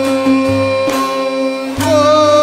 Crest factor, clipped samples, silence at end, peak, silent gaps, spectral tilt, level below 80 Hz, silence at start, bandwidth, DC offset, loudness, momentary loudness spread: 12 dB; under 0.1%; 0 s; 0 dBFS; none; -5 dB/octave; -46 dBFS; 0 s; 16 kHz; under 0.1%; -13 LUFS; 8 LU